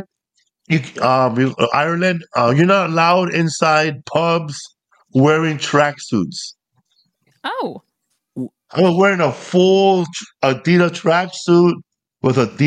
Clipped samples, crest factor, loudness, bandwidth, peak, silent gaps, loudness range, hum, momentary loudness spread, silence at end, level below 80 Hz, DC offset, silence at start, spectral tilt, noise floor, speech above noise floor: under 0.1%; 14 dB; -16 LUFS; 9.6 kHz; -2 dBFS; none; 5 LU; none; 13 LU; 0 s; -62 dBFS; under 0.1%; 0 s; -6 dB/octave; -66 dBFS; 51 dB